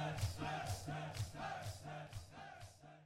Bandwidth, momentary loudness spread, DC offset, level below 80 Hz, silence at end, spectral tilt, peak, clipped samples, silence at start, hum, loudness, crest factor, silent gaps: 16 kHz; 12 LU; under 0.1%; -60 dBFS; 0 s; -5 dB/octave; -26 dBFS; under 0.1%; 0 s; none; -47 LUFS; 20 dB; none